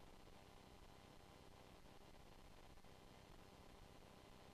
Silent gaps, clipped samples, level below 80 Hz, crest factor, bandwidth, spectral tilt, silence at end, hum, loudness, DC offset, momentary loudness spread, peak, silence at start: none; under 0.1%; -68 dBFS; 10 dB; 13.5 kHz; -4.5 dB/octave; 0 s; none; -65 LUFS; under 0.1%; 1 LU; -52 dBFS; 0 s